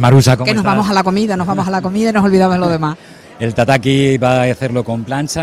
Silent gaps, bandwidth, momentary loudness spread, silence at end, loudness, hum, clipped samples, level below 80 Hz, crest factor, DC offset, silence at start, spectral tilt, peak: none; 15.5 kHz; 8 LU; 0 s; -14 LUFS; none; 0.2%; -42 dBFS; 12 dB; under 0.1%; 0 s; -6 dB/octave; 0 dBFS